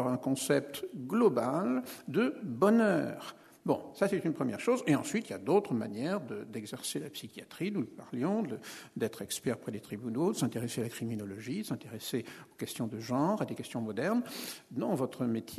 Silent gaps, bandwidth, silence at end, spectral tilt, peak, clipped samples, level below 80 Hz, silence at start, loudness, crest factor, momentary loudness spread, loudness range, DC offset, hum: none; 13.5 kHz; 0 s; -5.5 dB/octave; -12 dBFS; under 0.1%; -74 dBFS; 0 s; -34 LUFS; 20 dB; 12 LU; 6 LU; under 0.1%; none